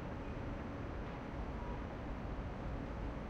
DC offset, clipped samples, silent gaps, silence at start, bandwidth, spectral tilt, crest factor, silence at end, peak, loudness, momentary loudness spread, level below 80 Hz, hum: under 0.1%; under 0.1%; none; 0 s; 8 kHz; -8 dB/octave; 12 dB; 0 s; -32 dBFS; -45 LUFS; 1 LU; -48 dBFS; none